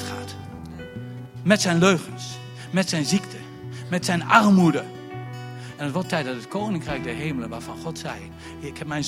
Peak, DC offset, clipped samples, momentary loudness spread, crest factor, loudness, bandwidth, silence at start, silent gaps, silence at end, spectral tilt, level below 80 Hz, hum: 0 dBFS; under 0.1%; under 0.1%; 19 LU; 24 dB; -23 LUFS; 15.5 kHz; 0 s; none; 0 s; -5 dB/octave; -54 dBFS; none